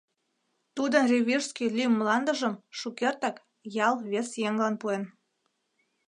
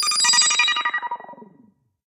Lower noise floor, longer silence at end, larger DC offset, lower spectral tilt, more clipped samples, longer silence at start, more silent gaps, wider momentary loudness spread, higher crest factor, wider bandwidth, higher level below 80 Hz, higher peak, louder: first, -77 dBFS vs -57 dBFS; first, 1 s vs 0.7 s; neither; first, -4 dB/octave vs 3.5 dB/octave; neither; first, 0.75 s vs 0 s; neither; second, 12 LU vs 17 LU; about the same, 20 dB vs 18 dB; second, 11 kHz vs 15.5 kHz; about the same, -80 dBFS vs -82 dBFS; second, -8 dBFS vs -4 dBFS; second, -28 LUFS vs -17 LUFS